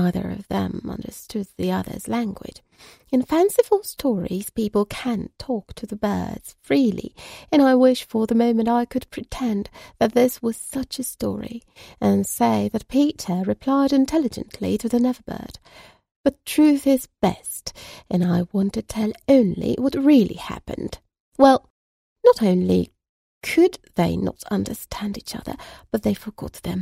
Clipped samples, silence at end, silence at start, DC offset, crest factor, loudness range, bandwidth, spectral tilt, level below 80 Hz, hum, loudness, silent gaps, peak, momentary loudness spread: under 0.1%; 0 s; 0 s; under 0.1%; 20 dB; 5 LU; 16 kHz; -6 dB/octave; -48 dBFS; none; -22 LUFS; 16.11-16.24 s, 21.20-21.32 s, 21.70-22.16 s, 23.09-23.41 s; -2 dBFS; 16 LU